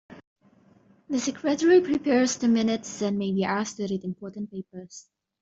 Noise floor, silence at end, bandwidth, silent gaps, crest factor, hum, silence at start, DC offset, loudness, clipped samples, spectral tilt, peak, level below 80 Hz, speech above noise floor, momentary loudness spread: -59 dBFS; 0.4 s; 8 kHz; 0.27-0.36 s; 16 dB; none; 0.1 s; under 0.1%; -25 LUFS; under 0.1%; -5 dB/octave; -10 dBFS; -66 dBFS; 34 dB; 19 LU